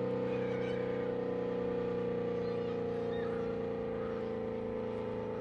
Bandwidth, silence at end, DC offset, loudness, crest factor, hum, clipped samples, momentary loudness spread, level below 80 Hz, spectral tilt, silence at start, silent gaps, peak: 6.8 kHz; 0 s; under 0.1%; -37 LUFS; 10 dB; none; under 0.1%; 3 LU; -60 dBFS; -8.5 dB/octave; 0 s; none; -24 dBFS